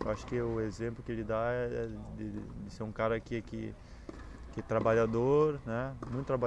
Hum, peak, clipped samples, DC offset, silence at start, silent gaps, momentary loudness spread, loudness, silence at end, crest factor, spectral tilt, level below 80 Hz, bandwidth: none; -16 dBFS; under 0.1%; under 0.1%; 0 s; none; 16 LU; -34 LUFS; 0 s; 18 dB; -7.5 dB/octave; -50 dBFS; 10 kHz